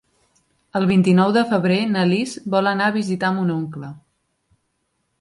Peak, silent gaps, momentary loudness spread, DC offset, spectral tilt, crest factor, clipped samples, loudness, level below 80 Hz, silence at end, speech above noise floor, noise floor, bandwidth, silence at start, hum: -4 dBFS; none; 12 LU; under 0.1%; -6.5 dB/octave; 16 dB; under 0.1%; -19 LUFS; -60 dBFS; 1.2 s; 53 dB; -71 dBFS; 11.5 kHz; 0.75 s; none